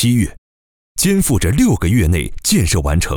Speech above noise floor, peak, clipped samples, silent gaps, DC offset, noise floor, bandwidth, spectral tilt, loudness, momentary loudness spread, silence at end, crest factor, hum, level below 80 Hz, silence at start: over 76 dB; -4 dBFS; under 0.1%; 0.38-0.95 s; under 0.1%; under -90 dBFS; over 20 kHz; -5 dB/octave; -15 LUFS; 4 LU; 0 s; 12 dB; none; -26 dBFS; 0 s